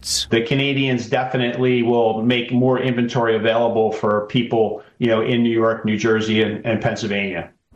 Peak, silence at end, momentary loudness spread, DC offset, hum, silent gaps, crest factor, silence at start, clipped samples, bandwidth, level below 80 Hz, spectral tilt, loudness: -6 dBFS; 0.3 s; 4 LU; under 0.1%; none; none; 14 dB; 0 s; under 0.1%; 14 kHz; -54 dBFS; -5.5 dB/octave; -19 LUFS